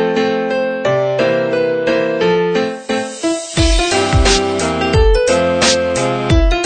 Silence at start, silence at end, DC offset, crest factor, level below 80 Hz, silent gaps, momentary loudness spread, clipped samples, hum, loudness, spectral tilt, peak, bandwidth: 0 s; 0 s; under 0.1%; 14 dB; -22 dBFS; none; 6 LU; under 0.1%; none; -14 LUFS; -4.5 dB/octave; 0 dBFS; 9.4 kHz